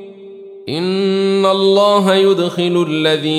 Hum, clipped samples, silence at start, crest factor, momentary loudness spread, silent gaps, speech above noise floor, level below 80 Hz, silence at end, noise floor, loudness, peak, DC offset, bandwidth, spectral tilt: none; under 0.1%; 0 s; 12 dB; 8 LU; none; 21 dB; -68 dBFS; 0 s; -34 dBFS; -14 LUFS; -2 dBFS; under 0.1%; 13.5 kHz; -5.5 dB/octave